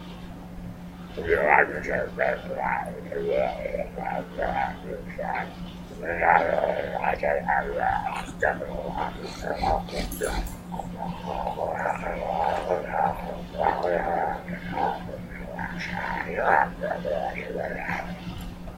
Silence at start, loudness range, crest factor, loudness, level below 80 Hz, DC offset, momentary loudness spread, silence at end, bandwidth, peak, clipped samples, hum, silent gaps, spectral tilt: 0 s; 4 LU; 26 dB; -27 LUFS; -42 dBFS; under 0.1%; 14 LU; 0 s; 16 kHz; -2 dBFS; under 0.1%; none; none; -5.5 dB/octave